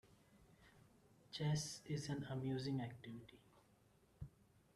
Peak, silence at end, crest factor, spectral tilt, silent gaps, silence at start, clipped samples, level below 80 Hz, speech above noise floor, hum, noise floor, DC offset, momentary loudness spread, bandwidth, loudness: -30 dBFS; 0.45 s; 18 dB; -5.5 dB/octave; none; 0.05 s; under 0.1%; -72 dBFS; 29 dB; none; -73 dBFS; under 0.1%; 17 LU; 13 kHz; -45 LUFS